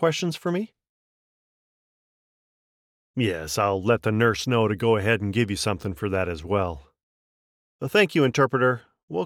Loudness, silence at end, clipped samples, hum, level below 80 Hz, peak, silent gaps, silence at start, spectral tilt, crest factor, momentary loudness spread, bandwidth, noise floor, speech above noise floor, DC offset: -24 LUFS; 0 s; under 0.1%; none; -52 dBFS; -6 dBFS; 0.89-3.14 s, 7.03-7.79 s, 9.03-9.08 s; 0 s; -5.5 dB/octave; 18 dB; 10 LU; 16.5 kHz; under -90 dBFS; over 67 dB; under 0.1%